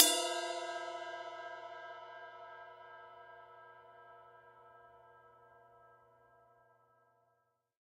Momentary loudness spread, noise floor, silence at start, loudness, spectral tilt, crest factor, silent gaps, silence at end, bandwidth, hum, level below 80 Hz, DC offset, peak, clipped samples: 23 LU; -79 dBFS; 0 s; -39 LUFS; 0.5 dB/octave; 36 dB; none; 2.25 s; 15.5 kHz; none; -90 dBFS; under 0.1%; -6 dBFS; under 0.1%